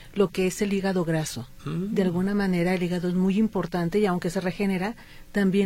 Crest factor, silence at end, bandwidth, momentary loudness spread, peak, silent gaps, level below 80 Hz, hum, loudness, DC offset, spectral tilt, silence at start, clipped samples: 14 dB; 0 s; 16 kHz; 8 LU; -10 dBFS; none; -48 dBFS; none; -26 LUFS; under 0.1%; -6.5 dB/octave; 0 s; under 0.1%